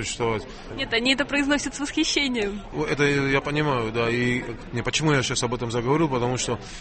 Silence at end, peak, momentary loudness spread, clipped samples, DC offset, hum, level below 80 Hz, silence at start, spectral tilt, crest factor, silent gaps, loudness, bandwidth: 0 s; -6 dBFS; 8 LU; under 0.1%; under 0.1%; none; -44 dBFS; 0 s; -4 dB/octave; 18 dB; none; -24 LUFS; 8.8 kHz